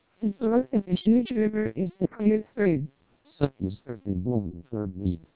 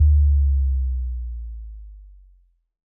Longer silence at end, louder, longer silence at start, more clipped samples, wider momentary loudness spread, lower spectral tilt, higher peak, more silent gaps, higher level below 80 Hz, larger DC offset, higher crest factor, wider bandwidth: second, 0.15 s vs 0.9 s; second, -27 LUFS vs -22 LUFS; first, 0.2 s vs 0 s; neither; second, 11 LU vs 22 LU; second, -12 dB/octave vs -27.5 dB/octave; about the same, -6 dBFS vs -8 dBFS; neither; second, -48 dBFS vs -22 dBFS; first, 0.2% vs under 0.1%; first, 20 dB vs 12 dB; first, 4 kHz vs 0.2 kHz